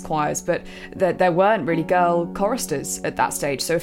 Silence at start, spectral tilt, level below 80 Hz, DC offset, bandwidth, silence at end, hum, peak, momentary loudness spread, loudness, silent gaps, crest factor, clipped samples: 0 s; -4.5 dB/octave; -48 dBFS; under 0.1%; 16.5 kHz; 0 s; none; -6 dBFS; 7 LU; -21 LUFS; none; 16 dB; under 0.1%